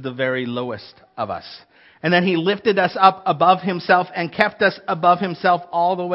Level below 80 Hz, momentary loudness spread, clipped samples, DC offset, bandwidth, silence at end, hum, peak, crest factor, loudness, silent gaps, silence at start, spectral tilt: -64 dBFS; 13 LU; under 0.1%; under 0.1%; 5.8 kHz; 0 s; none; 0 dBFS; 20 dB; -19 LUFS; none; 0 s; -8 dB/octave